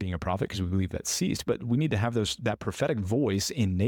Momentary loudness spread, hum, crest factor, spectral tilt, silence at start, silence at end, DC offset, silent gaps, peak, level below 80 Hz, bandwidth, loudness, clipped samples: 4 LU; none; 14 dB; -5 dB/octave; 0 s; 0 s; under 0.1%; none; -14 dBFS; -50 dBFS; 17.5 kHz; -29 LUFS; under 0.1%